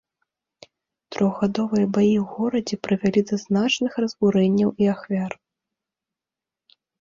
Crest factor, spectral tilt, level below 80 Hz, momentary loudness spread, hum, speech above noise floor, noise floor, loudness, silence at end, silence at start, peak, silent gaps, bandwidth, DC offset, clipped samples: 16 dB; -6.5 dB/octave; -60 dBFS; 7 LU; none; 68 dB; -89 dBFS; -22 LUFS; 1.65 s; 1.1 s; -6 dBFS; none; 7.6 kHz; under 0.1%; under 0.1%